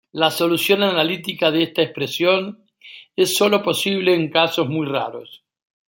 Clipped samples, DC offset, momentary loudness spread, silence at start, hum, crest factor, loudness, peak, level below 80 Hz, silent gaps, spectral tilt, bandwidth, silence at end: under 0.1%; under 0.1%; 7 LU; 0.15 s; none; 18 dB; -18 LUFS; -2 dBFS; -66 dBFS; none; -4 dB/octave; 17 kHz; 0.5 s